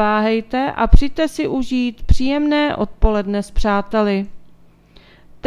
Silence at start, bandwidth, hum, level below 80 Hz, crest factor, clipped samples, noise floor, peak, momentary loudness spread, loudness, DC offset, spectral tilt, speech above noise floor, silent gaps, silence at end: 0 s; 11.5 kHz; none; -22 dBFS; 16 dB; under 0.1%; -47 dBFS; 0 dBFS; 5 LU; -19 LUFS; under 0.1%; -6.5 dB/octave; 32 dB; none; 0 s